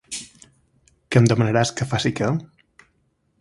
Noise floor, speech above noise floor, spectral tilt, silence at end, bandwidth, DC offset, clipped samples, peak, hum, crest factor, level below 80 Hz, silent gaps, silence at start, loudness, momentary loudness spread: -67 dBFS; 48 dB; -5.5 dB/octave; 0.95 s; 11.5 kHz; under 0.1%; under 0.1%; 0 dBFS; none; 22 dB; -52 dBFS; none; 0.1 s; -21 LUFS; 16 LU